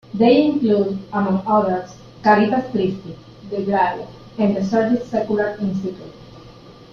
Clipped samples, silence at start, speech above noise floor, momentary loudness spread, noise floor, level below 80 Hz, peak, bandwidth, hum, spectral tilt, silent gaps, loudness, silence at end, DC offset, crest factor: under 0.1%; 0.15 s; 24 dB; 18 LU; -42 dBFS; -54 dBFS; -2 dBFS; 6.8 kHz; none; -7.5 dB/octave; none; -19 LUFS; 0.2 s; under 0.1%; 18 dB